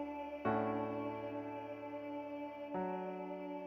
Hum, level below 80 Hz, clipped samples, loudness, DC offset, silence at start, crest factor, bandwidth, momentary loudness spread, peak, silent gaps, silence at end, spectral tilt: none; -74 dBFS; under 0.1%; -42 LUFS; under 0.1%; 0 s; 20 dB; 14 kHz; 9 LU; -22 dBFS; none; 0 s; -8.5 dB/octave